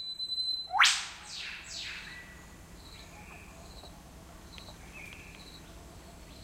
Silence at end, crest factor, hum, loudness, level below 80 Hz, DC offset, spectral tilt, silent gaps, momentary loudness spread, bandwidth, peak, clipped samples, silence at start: 0 s; 26 dB; none; -30 LUFS; -56 dBFS; under 0.1%; 0 dB/octave; none; 27 LU; 16 kHz; -10 dBFS; under 0.1%; 0 s